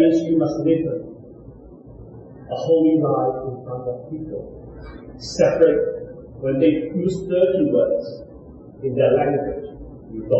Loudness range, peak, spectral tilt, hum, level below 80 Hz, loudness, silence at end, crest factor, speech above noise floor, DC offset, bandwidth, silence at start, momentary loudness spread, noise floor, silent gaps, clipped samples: 4 LU; -4 dBFS; -7.5 dB/octave; none; -48 dBFS; -20 LUFS; 0 s; 18 dB; 22 dB; under 0.1%; 8 kHz; 0 s; 22 LU; -42 dBFS; none; under 0.1%